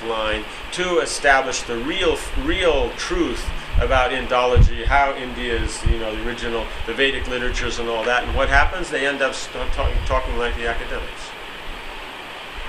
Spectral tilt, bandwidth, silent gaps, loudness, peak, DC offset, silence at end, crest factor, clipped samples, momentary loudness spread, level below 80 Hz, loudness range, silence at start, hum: -4 dB/octave; 13.5 kHz; none; -21 LUFS; 0 dBFS; under 0.1%; 0 s; 20 dB; under 0.1%; 14 LU; -26 dBFS; 4 LU; 0 s; none